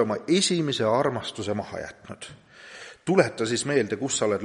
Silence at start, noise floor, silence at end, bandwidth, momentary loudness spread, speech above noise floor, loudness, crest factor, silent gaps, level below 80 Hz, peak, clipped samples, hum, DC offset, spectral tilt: 0 s; -45 dBFS; 0 s; 11.5 kHz; 19 LU; 20 dB; -25 LUFS; 20 dB; none; -64 dBFS; -6 dBFS; under 0.1%; none; under 0.1%; -4 dB/octave